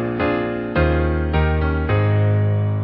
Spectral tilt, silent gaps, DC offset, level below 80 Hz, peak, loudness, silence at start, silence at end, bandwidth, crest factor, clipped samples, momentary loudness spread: -13 dB/octave; none; under 0.1%; -26 dBFS; -6 dBFS; -19 LUFS; 0 s; 0 s; 5 kHz; 12 dB; under 0.1%; 3 LU